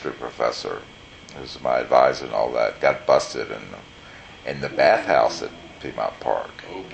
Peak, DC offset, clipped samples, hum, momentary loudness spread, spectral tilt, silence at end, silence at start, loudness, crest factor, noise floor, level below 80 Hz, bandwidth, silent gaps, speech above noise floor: -2 dBFS; under 0.1%; under 0.1%; none; 22 LU; -4 dB/octave; 0 s; 0 s; -22 LUFS; 22 dB; -43 dBFS; -54 dBFS; 8.8 kHz; none; 21 dB